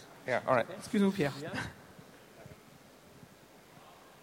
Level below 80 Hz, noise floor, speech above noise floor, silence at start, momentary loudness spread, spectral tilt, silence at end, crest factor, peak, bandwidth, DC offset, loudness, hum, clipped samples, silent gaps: -66 dBFS; -57 dBFS; 25 dB; 0 s; 26 LU; -6 dB/octave; 0.3 s; 22 dB; -14 dBFS; 16.5 kHz; under 0.1%; -33 LUFS; none; under 0.1%; none